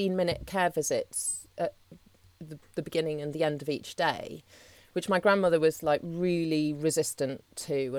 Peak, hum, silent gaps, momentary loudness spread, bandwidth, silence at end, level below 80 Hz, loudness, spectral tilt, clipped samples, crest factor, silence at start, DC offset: -10 dBFS; none; none; 13 LU; 18.5 kHz; 0 s; -60 dBFS; -29 LUFS; -4.5 dB/octave; under 0.1%; 20 dB; 0 s; under 0.1%